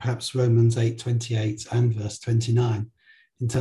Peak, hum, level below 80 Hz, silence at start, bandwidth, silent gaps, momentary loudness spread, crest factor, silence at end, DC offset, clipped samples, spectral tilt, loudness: -10 dBFS; none; -52 dBFS; 0 s; 11.5 kHz; none; 10 LU; 12 dB; 0 s; under 0.1%; under 0.1%; -6.5 dB/octave; -24 LUFS